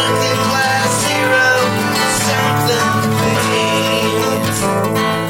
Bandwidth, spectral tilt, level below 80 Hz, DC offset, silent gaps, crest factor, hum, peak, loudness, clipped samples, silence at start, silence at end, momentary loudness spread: 16.5 kHz; -3.5 dB/octave; -46 dBFS; under 0.1%; none; 12 dB; none; -2 dBFS; -14 LUFS; under 0.1%; 0 s; 0 s; 4 LU